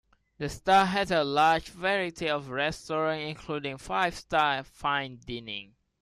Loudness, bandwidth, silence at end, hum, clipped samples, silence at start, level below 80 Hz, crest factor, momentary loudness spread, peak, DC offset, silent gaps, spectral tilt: -28 LUFS; 14 kHz; 0.4 s; none; under 0.1%; 0.4 s; -56 dBFS; 18 dB; 14 LU; -10 dBFS; under 0.1%; none; -4.5 dB/octave